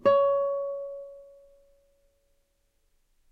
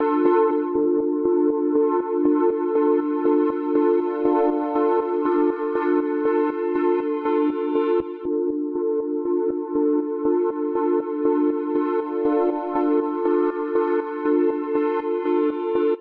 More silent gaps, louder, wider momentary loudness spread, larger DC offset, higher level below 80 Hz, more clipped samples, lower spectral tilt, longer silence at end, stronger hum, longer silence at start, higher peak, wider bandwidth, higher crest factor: neither; second, -27 LUFS vs -22 LUFS; first, 20 LU vs 4 LU; neither; second, -68 dBFS vs -62 dBFS; neither; second, -6.5 dB/octave vs -9 dB/octave; first, 2.1 s vs 0 s; neither; about the same, 0.05 s vs 0 s; second, -12 dBFS vs -6 dBFS; first, 4.8 kHz vs 4.2 kHz; first, 20 dB vs 14 dB